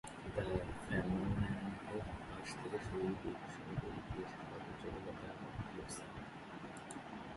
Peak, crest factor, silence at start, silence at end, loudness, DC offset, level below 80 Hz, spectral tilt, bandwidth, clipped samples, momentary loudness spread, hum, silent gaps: -24 dBFS; 20 dB; 0.05 s; 0 s; -44 LUFS; under 0.1%; -56 dBFS; -6 dB/octave; 11.5 kHz; under 0.1%; 10 LU; none; none